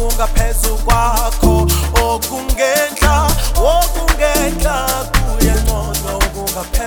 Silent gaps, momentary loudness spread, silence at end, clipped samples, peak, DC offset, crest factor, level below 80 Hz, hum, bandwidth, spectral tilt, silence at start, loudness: none; 5 LU; 0 s; under 0.1%; 0 dBFS; under 0.1%; 14 dB; -16 dBFS; none; over 20 kHz; -4 dB/octave; 0 s; -15 LUFS